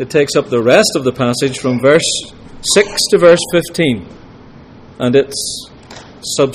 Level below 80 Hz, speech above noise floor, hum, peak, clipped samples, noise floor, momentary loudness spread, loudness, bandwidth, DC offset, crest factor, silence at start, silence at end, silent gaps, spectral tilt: -44 dBFS; 25 dB; none; 0 dBFS; under 0.1%; -37 dBFS; 13 LU; -13 LUFS; 15.5 kHz; under 0.1%; 14 dB; 0 s; 0 s; none; -4 dB/octave